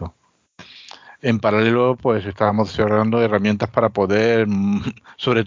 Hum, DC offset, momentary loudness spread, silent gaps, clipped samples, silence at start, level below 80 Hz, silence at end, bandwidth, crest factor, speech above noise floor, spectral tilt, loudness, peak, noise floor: none; under 0.1%; 9 LU; none; under 0.1%; 0 s; -46 dBFS; 0 s; 7.4 kHz; 16 dB; 40 dB; -7 dB/octave; -18 LUFS; -2 dBFS; -58 dBFS